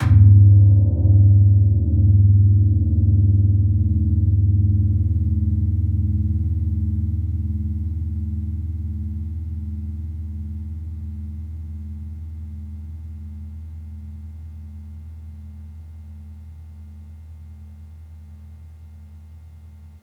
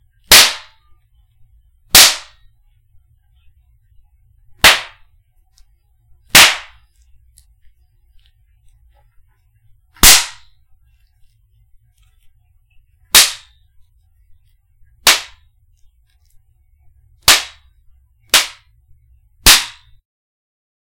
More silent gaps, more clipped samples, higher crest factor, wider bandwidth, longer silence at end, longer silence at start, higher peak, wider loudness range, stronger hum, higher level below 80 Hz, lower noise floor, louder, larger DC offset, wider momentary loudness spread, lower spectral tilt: neither; second, under 0.1% vs 0.6%; about the same, 16 dB vs 18 dB; second, 2.2 kHz vs 17 kHz; second, 0.15 s vs 1.3 s; second, 0 s vs 0.3 s; second, -4 dBFS vs 0 dBFS; first, 24 LU vs 5 LU; neither; about the same, -32 dBFS vs -36 dBFS; second, -42 dBFS vs -54 dBFS; second, -18 LUFS vs -9 LUFS; neither; first, 25 LU vs 19 LU; first, -11.5 dB/octave vs 0.5 dB/octave